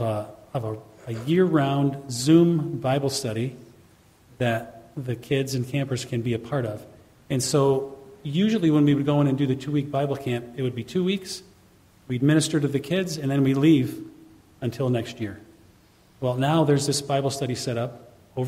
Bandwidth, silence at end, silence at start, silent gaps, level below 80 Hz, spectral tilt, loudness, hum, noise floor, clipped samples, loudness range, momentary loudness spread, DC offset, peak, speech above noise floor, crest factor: 15.5 kHz; 0 s; 0 s; none; -60 dBFS; -6 dB/octave; -24 LUFS; none; -56 dBFS; under 0.1%; 5 LU; 14 LU; under 0.1%; -6 dBFS; 33 dB; 18 dB